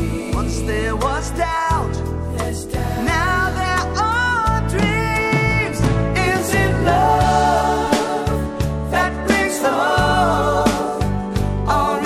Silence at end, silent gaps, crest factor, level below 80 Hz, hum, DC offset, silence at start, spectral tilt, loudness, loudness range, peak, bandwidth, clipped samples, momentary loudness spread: 0 s; none; 16 dB; -28 dBFS; none; under 0.1%; 0 s; -5.5 dB/octave; -18 LUFS; 3 LU; -2 dBFS; 15.5 kHz; under 0.1%; 7 LU